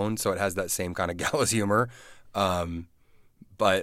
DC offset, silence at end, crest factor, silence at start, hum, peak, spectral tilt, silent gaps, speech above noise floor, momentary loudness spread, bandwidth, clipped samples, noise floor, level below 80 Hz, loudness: under 0.1%; 0 s; 20 dB; 0 s; none; -8 dBFS; -4 dB/octave; none; 29 dB; 9 LU; 16.5 kHz; under 0.1%; -57 dBFS; -54 dBFS; -27 LUFS